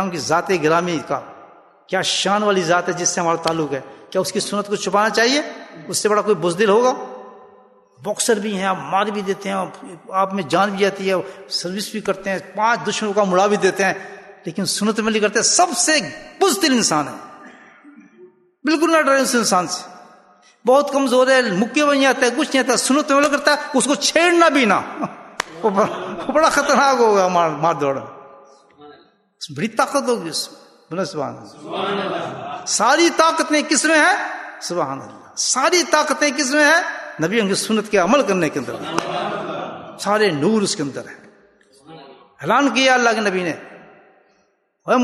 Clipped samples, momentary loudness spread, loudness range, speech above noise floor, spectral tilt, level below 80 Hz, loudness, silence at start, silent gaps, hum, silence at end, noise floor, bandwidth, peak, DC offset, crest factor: under 0.1%; 14 LU; 6 LU; 45 dB; -3 dB/octave; -62 dBFS; -18 LUFS; 0 s; none; none; 0 s; -63 dBFS; 12.5 kHz; 0 dBFS; under 0.1%; 18 dB